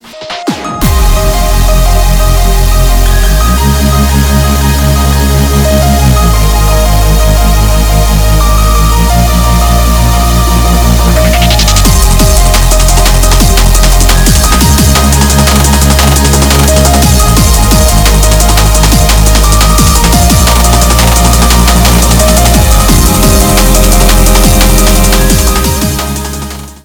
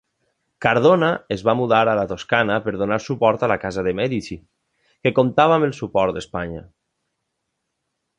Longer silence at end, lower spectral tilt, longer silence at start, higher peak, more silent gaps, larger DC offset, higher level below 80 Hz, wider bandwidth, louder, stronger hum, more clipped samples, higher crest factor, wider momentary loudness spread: second, 0.1 s vs 1.55 s; second, -4 dB/octave vs -6.5 dB/octave; second, 0.05 s vs 0.6 s; about the same, 0 dBFS vs -2 dBFS; neither; neither; first, -8 dBFS vs -50 dBFS; first, over 20 kHz vs 9.6 kHz; first, -7 LUFS vs -19 LUFS; neither; first, 9% vs under 0.1%; second, 6 dB vs 18 dB; second, 3 LU vs 12 LU